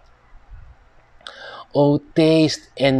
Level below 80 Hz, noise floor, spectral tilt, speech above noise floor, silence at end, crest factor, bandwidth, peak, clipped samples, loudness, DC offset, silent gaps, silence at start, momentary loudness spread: -48 dBFS; -50 dBFS; -6 dB/octave; 33 dB; 0 s; 16 dB; 11 kHz; -4 dBFS; under 0.1%; -18 LUFS; under 0.1%; none; 0.5 s; 23 LU